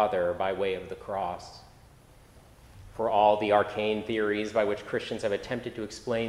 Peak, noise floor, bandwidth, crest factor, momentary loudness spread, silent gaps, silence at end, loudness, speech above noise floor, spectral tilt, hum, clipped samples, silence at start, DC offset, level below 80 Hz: -8 dBFS; -55 dBFS; 14 kHz; 20 dB; 13 LU; none; 0 s; -29 LUFS; 27 dB; -5.5 dB/octave; none; under 0.1%; 0 s; under 0.1%; -58 dBFS